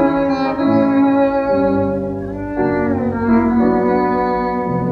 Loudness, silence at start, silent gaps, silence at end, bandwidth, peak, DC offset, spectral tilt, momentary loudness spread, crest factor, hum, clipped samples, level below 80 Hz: -16 LUFS; 0 s; none; 0 s; 6.2 kHz; -4 dBFS; under 0.1%; -9.5 dB/octave; 6 LU; 12 dB; none; under 0.1%; -40 dBFS